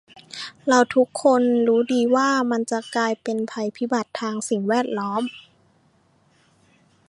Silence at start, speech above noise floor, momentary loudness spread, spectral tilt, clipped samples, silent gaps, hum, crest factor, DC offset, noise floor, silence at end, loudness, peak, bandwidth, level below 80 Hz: 0.35 s; 40 dB; 10 LU; -4 dB/octave; under 0.1%; none; none; 20 dB; under 0.1%; -61 dBFS; 1.7 s; -21 LUFS; -2 dBFS; 11.5 kHz; -72 dBFS